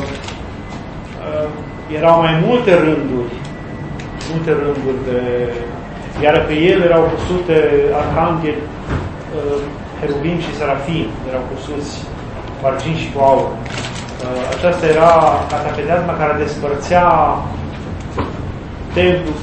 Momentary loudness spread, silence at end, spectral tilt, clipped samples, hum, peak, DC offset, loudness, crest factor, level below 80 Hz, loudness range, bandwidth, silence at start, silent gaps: 15 LU; 0 s; -6.5 dB/octave; under 0.1%; none; 0 dBFS; under 0.1%; -16 LUFS; 16 dB; -34 dBFS; 6 LU; 8.8 kHz; 0 s; none